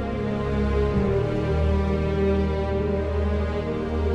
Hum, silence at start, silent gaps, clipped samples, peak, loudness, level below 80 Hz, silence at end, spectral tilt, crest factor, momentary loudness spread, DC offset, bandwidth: none; 0 s; none; under 0.1%; -10 dBFS; -24 LUFS; -28 dBFS; 0 s; -8.5 dB/octave; 12 dB; 4 LU; under 0.1%; 7 kHz